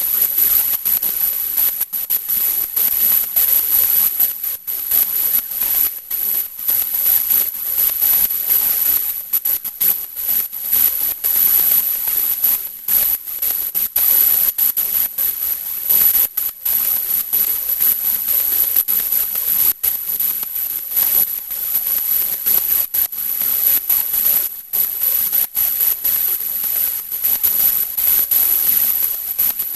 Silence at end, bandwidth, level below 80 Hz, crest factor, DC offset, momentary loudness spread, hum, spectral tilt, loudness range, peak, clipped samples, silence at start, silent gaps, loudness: 0 s; 16 kHz; -50 dBFS; 16 dB; under 0.1%; 6 LU; none; 1 dB/octave; 2 LU; -2 dBFS; under 0.1%; 0 s; none; -14 LUFS